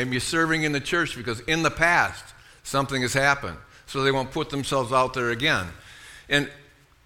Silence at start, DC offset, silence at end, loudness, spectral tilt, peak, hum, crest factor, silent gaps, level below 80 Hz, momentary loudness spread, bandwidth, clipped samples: 0 s; under 0.1%; 0.45 s; -24 LUFS; -4 dB/octave; -4 dBFS; none; 20 dB; none; -48 dBFS; 16 LU; 17.5 kHz; under 0.1%